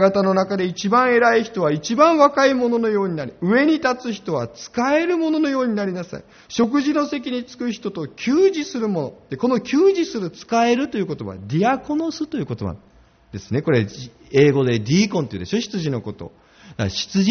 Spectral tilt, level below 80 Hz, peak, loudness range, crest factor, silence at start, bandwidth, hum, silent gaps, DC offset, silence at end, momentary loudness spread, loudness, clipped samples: -5 dB/octave; -54 dBFS; 0 dBFS; 5 LU; 18 dB; 0 s; 6.6 kHz; none; none; under 0.1%; 0 s; 13 LU; -20 LUFS; under 0.1%